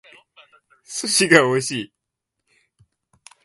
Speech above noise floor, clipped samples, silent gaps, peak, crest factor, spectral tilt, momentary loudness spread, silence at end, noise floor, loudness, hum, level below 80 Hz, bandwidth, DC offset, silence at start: 63 dB; under 0.1%; none; 0 dBFS; 24 dB; -3 dB/octave; 17 LU; 1.6 s; -81 dBFS; -18 LUFS; none; -66 dBFS; 12 kHz; under 0.1%; 0.9 s